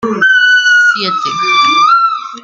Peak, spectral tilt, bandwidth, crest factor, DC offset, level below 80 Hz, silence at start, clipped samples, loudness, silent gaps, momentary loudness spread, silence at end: 0 dBFS; -1.5 dB/octave; 7.8 kHz; 10 dB; under 0.1%; -60 dBFS; 0 s; under 0.1%; -8 LUFS; none; 7 LU; 0.05 s